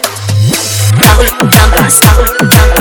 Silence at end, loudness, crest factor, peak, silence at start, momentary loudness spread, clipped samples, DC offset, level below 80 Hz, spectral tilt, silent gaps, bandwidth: 0 s; -6 LUFS; 6 dB; 0 dBFS; 0 s; 6 LU; 3%; under 0.1%; -12 dBFS; -4 dB/octave; none; over 20 kHz